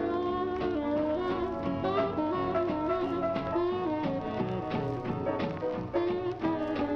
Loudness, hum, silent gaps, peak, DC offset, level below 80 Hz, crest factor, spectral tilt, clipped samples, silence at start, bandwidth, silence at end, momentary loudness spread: -31 LUFS; none; none; -16 dBFS; under 0.1%; -52 dBFS; 14 dB; -8.5 dB/octave; under 0.1%; 0 s; 6.4 kHz; 0 s; 3 LU